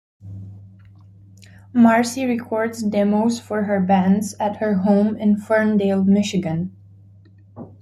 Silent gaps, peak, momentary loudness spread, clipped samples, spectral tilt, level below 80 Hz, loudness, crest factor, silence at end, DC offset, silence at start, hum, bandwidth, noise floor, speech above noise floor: none; -2 dBFS; 17 LU; under 0.1%; -6.5 dB/octave; -60 dBFS; -19 LUFS; 18 dB; 0.15 s; under 0.1%; 0.25 s; none; 13 kHz; -48 dBFS; 30 dB